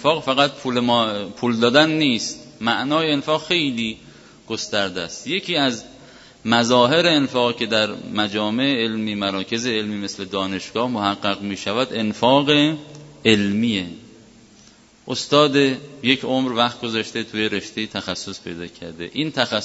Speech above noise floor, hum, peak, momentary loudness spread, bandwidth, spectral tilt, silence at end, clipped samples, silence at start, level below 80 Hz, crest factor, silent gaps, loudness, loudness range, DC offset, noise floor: 30 dB; none; 0 dBFS; 13 LU; 8 kHz; -4 dB/octave; 0 s; under 0.1%; 0 s; -60 dBFS; 20 dB; none; -20 LUFS; 4 LU; under 0.1%; -50 dBFS